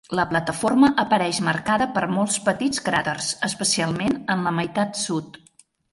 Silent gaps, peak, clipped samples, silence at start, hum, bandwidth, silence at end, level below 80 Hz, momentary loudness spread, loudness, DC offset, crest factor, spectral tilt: none; -6 dBFS; under 0.1%; 0.1 s; none; 11.5 kHz; 0.65 s; -56 dBFS; 7 LU; -22 LUFS; under 0.1%; 16 dB; -4 dB/octave